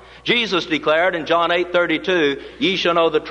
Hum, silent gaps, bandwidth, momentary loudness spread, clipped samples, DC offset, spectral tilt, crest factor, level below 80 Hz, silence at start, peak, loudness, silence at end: none; none; 9.8 kHz; 3 LU; under 0.1%; under 0.1%; -4.5 dB/octave; 14 dB; -52 dBFS; 0.1 s; -4 dBFS; -18 LUFS; 0 s